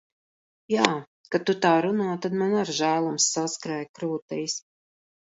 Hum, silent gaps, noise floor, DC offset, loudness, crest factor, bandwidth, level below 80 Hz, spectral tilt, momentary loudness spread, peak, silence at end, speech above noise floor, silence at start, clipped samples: none; 1.07-1.24 s, 3.89-3.94 s, 4.22-4.28 s; under -90 dBFS; under 0.1%; -25 LUFS; 26 dB; 8 kHz; -72 dBFS; -3.5 dB/octave; 10 LU; 0 dBFS; 0.7 s; over 65 dB; 0.7 s; under 0.1%